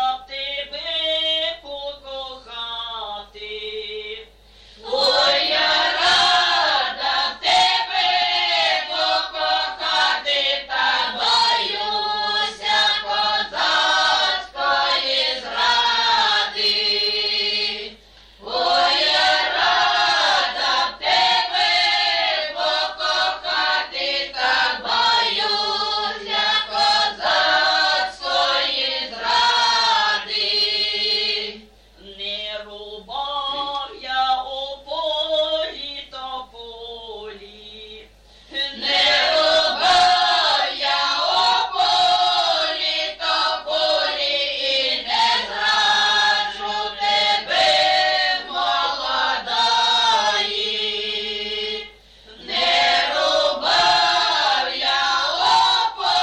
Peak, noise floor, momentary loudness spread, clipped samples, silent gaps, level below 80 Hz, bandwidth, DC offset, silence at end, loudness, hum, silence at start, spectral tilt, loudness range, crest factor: -6 dBFS; -48 dBFS; 13 LU; under 0.1%; none; -54 dBFS; 10 kHz; under 0.1%; 0 s; -18 LUFS; none; 0 s; 0 dB/octave; 8 LU; 14 dB